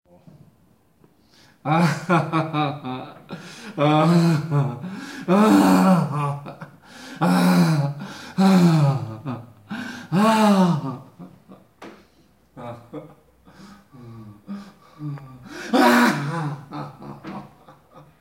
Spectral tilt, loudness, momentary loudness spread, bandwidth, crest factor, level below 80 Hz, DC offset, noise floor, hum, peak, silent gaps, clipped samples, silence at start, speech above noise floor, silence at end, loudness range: -6.5 dB/octave; -19 LUFS; 23 LU; 16 kHz; 18 dB; -64 dBFS; under 0.1%; -59 dBFS; none; -4 dBFS; none; under 0.1%; 1.65 s; 40 dB; 0.75 s; 13 LU